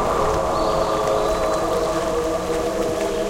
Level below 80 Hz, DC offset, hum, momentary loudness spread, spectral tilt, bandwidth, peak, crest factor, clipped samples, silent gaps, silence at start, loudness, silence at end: -36 dBFS; under 0.1%; none; 3 LU; -4.5 dB/octave; 17 kHz; -6 dBFS; 14 dB; under 0.1%; none; 0 s; -21 LUFS; 0 s